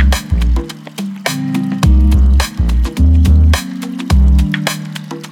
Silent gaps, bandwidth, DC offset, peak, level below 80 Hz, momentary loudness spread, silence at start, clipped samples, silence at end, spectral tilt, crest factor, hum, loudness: none; 16 kHz; under 0.1%; 0 dBFS; -12 dBFS; 13 LU; 0 s; under 0.1%; 0 s; -6 dB/octave; 12 dB; none; -13 LUFS